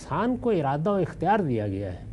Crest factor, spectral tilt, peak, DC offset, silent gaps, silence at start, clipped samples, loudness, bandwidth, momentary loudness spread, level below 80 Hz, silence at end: 14 dB; -8 dB/octave; -12 dBFS; under 0.1%; none; 0 s; under 0.1%; -26 LUFS; 11.5 kHz; 5 LU; -48 dBFS; 0 s